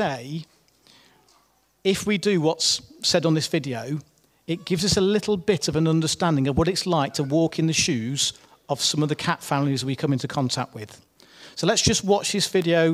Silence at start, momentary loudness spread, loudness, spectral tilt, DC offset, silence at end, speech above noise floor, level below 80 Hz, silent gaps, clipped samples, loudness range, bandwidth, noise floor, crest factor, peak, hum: 0 s; 11 LU; -23 LUFS; -4 dB/octave; under 0.1%; 0 s; 40 dB; -48 dBFS; none; under 0.1%; 3 LU; 16 kHz; -63 dBFS; 18 dB; -6 dBFS; none